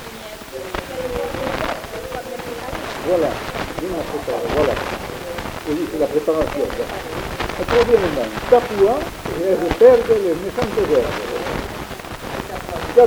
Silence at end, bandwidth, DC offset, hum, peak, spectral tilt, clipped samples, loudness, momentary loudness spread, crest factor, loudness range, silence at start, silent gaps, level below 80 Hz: 0 s; over 20 kHz; under 0.1%; none; 0 dBFS; -5 dB/octave; under 0.1%; -20 LUFS; 13 LU; 18 dB; 8 LU; 0 s; none; -38 dBFS